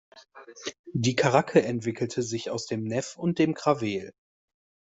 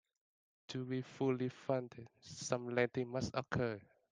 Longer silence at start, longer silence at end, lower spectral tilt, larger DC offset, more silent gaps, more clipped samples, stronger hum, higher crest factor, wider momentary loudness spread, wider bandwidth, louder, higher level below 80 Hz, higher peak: second, 0.15 s vs 0.7 s; first, 0.85 s vs 0.3 s; about the same, -5.5 dB/octave vs -5.5 dB/octave; neither; first, 0.79-0.84 s vs none; neither; neither; about the same, 22 dB vs 22 dB; about the same, 14 LU vs 13 LU; second, 8.2 kHz vs 9.8 kHz; first, -27 LUFS vs -40 LUFS; first, -64 dBFS vs -70 dBFS; first, -6 dBFS vs -18 dBFS